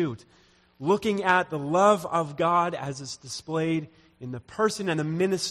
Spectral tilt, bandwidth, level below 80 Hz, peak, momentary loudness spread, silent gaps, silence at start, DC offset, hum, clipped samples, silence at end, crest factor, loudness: -5 dB/octave; 15.5 kHz; -64 dBFS; -6 dBFS; 16 LU; none; 0 s; under 0.1%; none; under 0.1%; 0 s; 20 dB; -26 LUFS